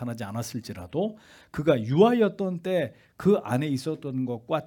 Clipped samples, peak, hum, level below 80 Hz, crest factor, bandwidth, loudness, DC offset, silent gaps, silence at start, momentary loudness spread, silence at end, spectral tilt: under 0.1%; -6 dBFS; none; -62 dBFS; 20 dB; 18 kHz; -26 LUFS; under 0.1%; none; 0 s; 13 LU; 0 s; -7 dB/octave